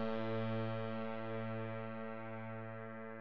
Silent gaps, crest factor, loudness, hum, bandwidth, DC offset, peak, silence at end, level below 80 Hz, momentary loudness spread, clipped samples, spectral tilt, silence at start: none; 14 dB; -43 LUFS; none; 5.6 kHz; 0.3%; -26 dBFS; 0 s; -86 dBFS; 8 LU; under 0.1%; -6 dB/octave; 0 s